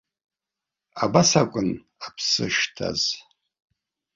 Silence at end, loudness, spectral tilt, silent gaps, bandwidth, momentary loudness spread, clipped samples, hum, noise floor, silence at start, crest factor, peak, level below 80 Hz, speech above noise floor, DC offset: 0.95 s; -22 LUFS; -3.5 dB/octave; none; 7.8 kHz; 17 LU; under 0.1%; none; -88 dBFS; 0.95 s; 24 dB; -2 dBFS; -56 dBFS; 65 dB; under 0.1%